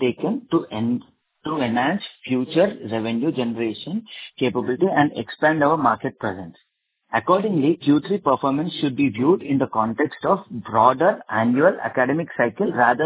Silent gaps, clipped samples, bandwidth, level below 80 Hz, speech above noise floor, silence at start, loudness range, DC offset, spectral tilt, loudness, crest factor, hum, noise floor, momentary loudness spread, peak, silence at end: none; under 0.1%; 4 kHz; -60 dBFS; 36 dB; 0 s; 4 LU; under 0.1%; -10.5 dB/octave; -21 LUFS; 20 dB; none; -56 dBFS; 9 LU; -2 dBFS; 0 s